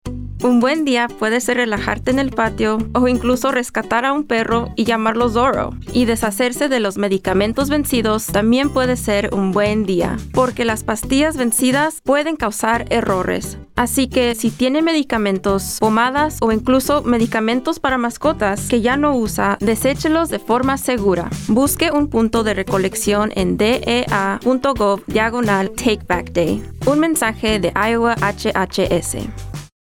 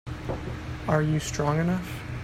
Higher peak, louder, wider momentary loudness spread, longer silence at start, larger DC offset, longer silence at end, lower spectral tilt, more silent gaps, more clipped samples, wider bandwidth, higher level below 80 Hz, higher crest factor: first, -2 dBFS vs -10 dBFS; first, -17 LUFS vs -28 LUFS; second, 4 LU vs 10 LU; about the same, 0.05 s vs 0.05 s; neither; first, 0.3 s vs 0 s; second, -4.5 dB/octave vs -6 dB/octave; neither; neither; first, 18 kHz vs 15.5 kHz; first, -36 dBFS vs -44 dBFS; about the same, 14 dB vs 18 dB